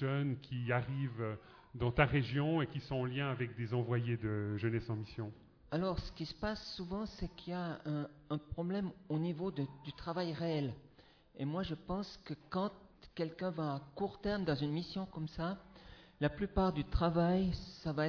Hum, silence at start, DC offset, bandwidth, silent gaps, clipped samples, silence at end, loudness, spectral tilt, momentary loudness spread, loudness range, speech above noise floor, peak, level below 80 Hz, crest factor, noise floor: none; 0 s; under 0.1%; 5.4 kHz; none; under 0.1%; 0 s; -38 LUFS; -6 dB/octave; 9 LU; 5 LU; 26 dB; -14 dBFS; -52 dBFS; 24 dB; -64 dBFS